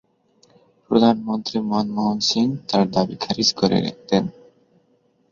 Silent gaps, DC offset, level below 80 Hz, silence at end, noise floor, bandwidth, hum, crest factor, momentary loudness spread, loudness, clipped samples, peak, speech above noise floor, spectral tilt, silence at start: none; under 0.1%; -58 dBFS; 1 s; -62 dBFS; 7.2 kHz; none; 20 dB; 6 LU; -20 LUFS; under 0.1%; -2 dBFS; 42 dB; -5 dB/octave; 0.9 s